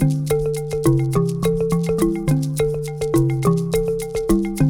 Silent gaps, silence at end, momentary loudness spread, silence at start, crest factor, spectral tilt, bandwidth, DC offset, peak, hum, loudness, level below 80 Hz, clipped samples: none; 0 s; 4 LU; 0 s; 14 dB; -7.5 dB/octave; 17.5 kHz; under 0.1%; -4 dBFS; none; -20 LUFS; -34 dBFS; under 0.1%